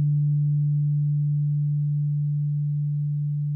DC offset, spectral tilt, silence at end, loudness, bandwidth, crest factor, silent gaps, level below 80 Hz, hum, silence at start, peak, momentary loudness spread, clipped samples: under 0.1%; -15 dB/octave; 0 s; -24 LUFS; 0.5 kHz; 6 dB; none; -64 dBFS; none; 0 s; -18 dBFS; 4 LU; under 0.1%